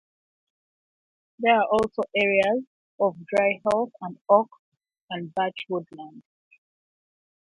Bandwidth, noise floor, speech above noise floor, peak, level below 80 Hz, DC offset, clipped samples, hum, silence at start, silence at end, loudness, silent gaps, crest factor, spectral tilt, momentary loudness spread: 11.5 kHz; under -90 dBFS; over 66 dB; -4 dBFS; -64 dBFS; under 0.1%; under 0.1%; none; 1.4 s; 1.2 s; -24 LUFS; 2.67-2.98 s, 4.21-4.25 s, 4.59-4.72 s, 5.01-5.08 s; 22 dB; -5.5 dB/octave; 15 LU